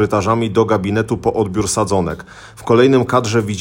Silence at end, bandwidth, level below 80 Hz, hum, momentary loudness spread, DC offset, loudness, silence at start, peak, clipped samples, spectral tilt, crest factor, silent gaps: 0 s; 17 kHz; -44 dBFS; none; 7 LU; under 0.1%; -16 LUFS; 0 s; 0 dBFS; under 0.1%; -5.5 dB/octave; 14 dB; none